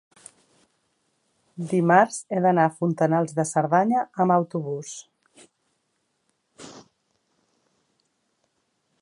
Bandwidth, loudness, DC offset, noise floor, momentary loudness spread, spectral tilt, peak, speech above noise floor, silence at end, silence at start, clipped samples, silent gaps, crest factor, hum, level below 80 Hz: 11.5 kHz; -22 LUFS; under 0.1%; -74 dBFS; 22 LU; -6.5 dB/octave; -2 dBFS; 52 dB; 2.2 s; 1.6 s; under 0.1%; none; 24 dB; none; -74 dBFS